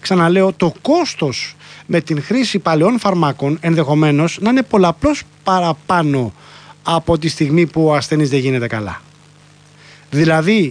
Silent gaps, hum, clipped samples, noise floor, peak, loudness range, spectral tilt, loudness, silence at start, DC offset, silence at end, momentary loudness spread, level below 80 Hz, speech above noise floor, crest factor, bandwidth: none; none; under 0.1%; -45 dBFS; -2 dBFS; 2 LU; -6 dB/octave; -15 LUFS; 0 s; under 0.1%; 0 s; 8 LU; -44 dBFS; 31 dB; 14 dB; 10.5 kHz